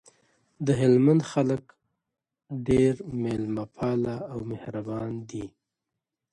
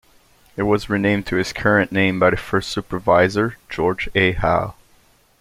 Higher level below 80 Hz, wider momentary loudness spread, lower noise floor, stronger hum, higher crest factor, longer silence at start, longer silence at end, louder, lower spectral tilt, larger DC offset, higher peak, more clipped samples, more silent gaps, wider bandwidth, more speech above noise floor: second, -54 dBFS vs -40 dBFS; first, 15 LU vs 8 LU; first, -86 dBFS vs -55 dBFS; neither; about the same, 18 dB vs 18 dB; about the same, 0.6 s vs 0.55 s; first, 0.85 s vs 0.7 s; second, -26 LUFS vs -19 LUFS; first, -8 dB/octave vs -6 dB/octave; neither; second, -10 dBFS vs -2 dBFS; neither; neither; second, 11 kHz vs 16 kHz; first, 60 dB vs 37 dB